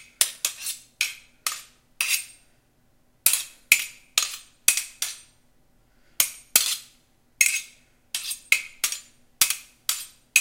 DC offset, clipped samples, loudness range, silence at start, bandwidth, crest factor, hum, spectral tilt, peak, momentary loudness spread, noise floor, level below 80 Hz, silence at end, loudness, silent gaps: under 0.1%; under 0.1%; 3 LU; 0.2 s; 17 kHz; 28 dB; none; 3.5 dB/octave; 0 dBFS; 11 LU; -62 dBFS; -66 dBFS; 0 s; -24 LUFS; none